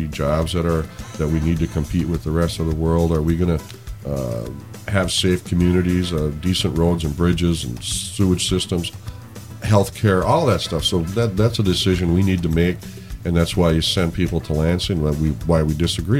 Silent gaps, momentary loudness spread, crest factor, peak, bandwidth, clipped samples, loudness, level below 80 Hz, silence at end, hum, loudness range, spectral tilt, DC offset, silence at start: none; 10 LU; 18 dB; -2 dBFS; 16 kHz; under 0.1%; -20 LUFS; -32 dBFS; 0 s; none; 3 LU; -5.5 dB/octave; 0.2%; 0 s